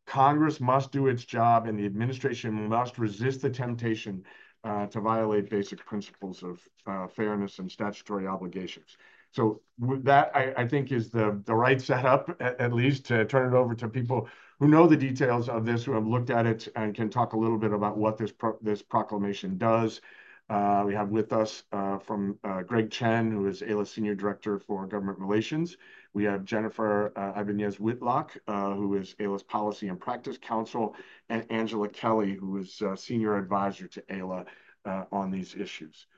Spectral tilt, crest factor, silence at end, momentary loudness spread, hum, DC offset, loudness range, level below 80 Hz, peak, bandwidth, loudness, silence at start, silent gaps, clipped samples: -7.5 dB/octave; 22 dB; 0.3 s; 12 LU; none; under 0.1%; 7 LU; -66 dBFS; -6 dBFS; 7.6 kHz; -29 LUFS; 0.05 s; none; under 0.1%